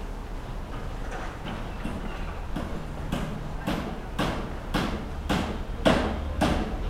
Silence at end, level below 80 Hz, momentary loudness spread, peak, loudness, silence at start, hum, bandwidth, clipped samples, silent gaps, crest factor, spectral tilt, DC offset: 0 s; -34 dBFS; 11 LU; -8 dBFS; -31 LUFS; 0 s; none; 16 kHz; under 0.1%; none; 22 dB; -6 dB/octave; under 0.1%